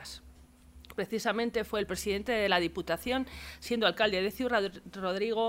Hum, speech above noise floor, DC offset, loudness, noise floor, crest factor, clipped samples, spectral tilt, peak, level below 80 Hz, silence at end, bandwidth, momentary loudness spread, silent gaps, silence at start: none; 24 dB; under 0.1%; -31 LUFS; -56 dBFS; 22 dB; under 0.1%; -4 dB/octave; -10 dBFS; -54 dBFS; 0 s; 16 kHz; 12 LU; none; 0 s